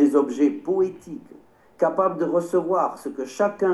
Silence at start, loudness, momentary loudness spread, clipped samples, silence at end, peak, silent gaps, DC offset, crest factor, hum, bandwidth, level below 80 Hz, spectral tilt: 0 s; -23 LUFS; 11 LU; under 0.1%; 0 s; -6 dBFS; none; under 0.1%; 16 dB; none; 12.5 kHz; -70 dBFS; -7 dB/octave